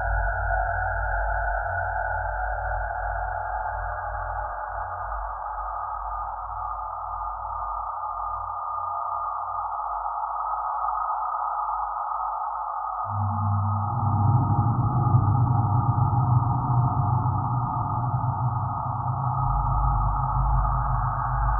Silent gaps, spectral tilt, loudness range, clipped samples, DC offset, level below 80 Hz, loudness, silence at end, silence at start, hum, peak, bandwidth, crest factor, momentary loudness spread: none; -14 dB/octave; 8 LU; under 0.1%; under 0.1%; -34 dBFS; -26 LUFS; 0 s; 0 s; none; -8 dBFS; 1.9 kHz; 18 dB; 9 LU